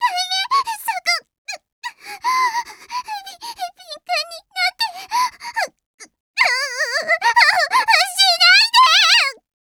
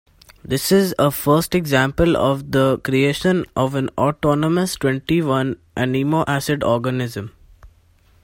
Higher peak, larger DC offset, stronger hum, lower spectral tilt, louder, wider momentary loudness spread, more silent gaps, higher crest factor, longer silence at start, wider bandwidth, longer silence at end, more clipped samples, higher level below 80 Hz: about the same, 0 dBFS vs -2 dBFS; neither; neither; second, 3 dB/octave vs -5.5 dB/octave; first, -15 LUFS vs -19 LUFS; first, 21 LU vs 7 LU; first, 1.38-1.45 s, 1.72-1.82 s, 5.86-5.98 s, 6.20-6.34 s vs none; about the same, 18 dB vs 16 dB; second, 0 s vs 0.45 s; first, 19.5 kHz vs 16.5 kHz; about the same, 0.45 s vs 0.55 s; neither; second, -70 dBFS vs -42 dBFS